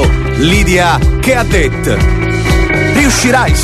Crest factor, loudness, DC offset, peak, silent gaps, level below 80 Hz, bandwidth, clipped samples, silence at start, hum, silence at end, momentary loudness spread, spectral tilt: 10 dB; -10 LUFS; under 0.1%; 0 dBFS; none; -14 dBFS; 14 kHz; under 0.1%; 0 s; none; 0 s; 4 LU; -5 dB/octave